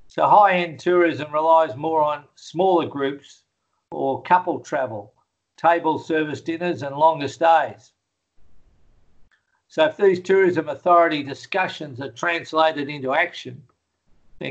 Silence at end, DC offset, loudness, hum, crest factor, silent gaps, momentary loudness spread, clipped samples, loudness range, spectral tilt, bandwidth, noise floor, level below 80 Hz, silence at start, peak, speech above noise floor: 0 s; under 0.1%; -20 LUFS; none; 20 dB; none; 13 LU; under 0.1%; 4 LU; -5.5 dB/octave; 8.2 kHz; -60 dBFS; -66 dBFS; 0.15 s; -2 dBFS; 40 dB